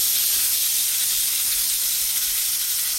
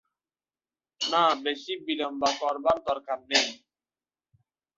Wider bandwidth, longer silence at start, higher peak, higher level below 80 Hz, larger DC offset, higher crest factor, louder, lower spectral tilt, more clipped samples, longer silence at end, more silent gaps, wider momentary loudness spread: first, 17 kHz vs 8.2 kHz; second, 0 s vs 1 s; about the same, -8 dBFS vs -8 dBFS; first, -54 dBFS vs -68 dBFS; neither; second, 14 dB vs 22 dB; first, -18 LUFS vs -27 LUFS; second, 3.5 dB/octave vs -1.5 dB/octave; neither; second, 0 s vs 1.2 s; neither; second, 2 LU vs 8 LU